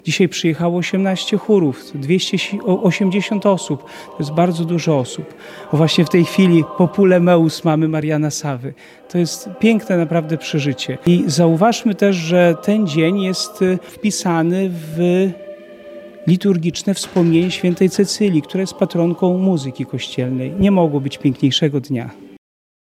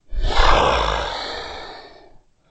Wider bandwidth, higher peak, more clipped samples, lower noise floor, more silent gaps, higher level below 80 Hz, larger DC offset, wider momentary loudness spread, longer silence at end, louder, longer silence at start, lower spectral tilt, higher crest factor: first, 14.5 kHz vs 8.4 kHz; about the same, 0 dBFS vs -2 dBFS; neither; second, -36 dBFS vs -49 dBFS; neither; second, -52 dBFS vs -24 dBFS; neither; second, 11 LU vs 20 LU; about the same, 0.6 s vs 0.65 s; first, -16 LUFS vs -20 LUFS; about the same, 0.05 s vs 0.1 s; first, -6 dB/octave vs -4 dB/octave; about the same, 16 dB vs 18 dB